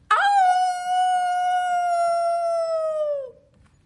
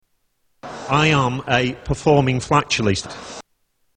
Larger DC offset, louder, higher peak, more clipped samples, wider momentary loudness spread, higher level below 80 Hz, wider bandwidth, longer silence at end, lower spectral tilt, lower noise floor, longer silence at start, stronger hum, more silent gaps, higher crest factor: neither; second, -22 LUFS vs -18 LUFS; second, -8 dBFS vs 0 dBFS; neither; second, 8 LU vs 18 LU; second, -68 dBFS vs -42 dBFS; first, 11.5 kHz vs 10 kHz; about the same, 0.55 s vs 0.55 s; second, 0 dB/octave vs -5 dB/octave; second, -56 dBFS vs -66 dBFS; second, 0.1 s vs 0.65 s; neither; neither; second, 14 dB vs 20 dB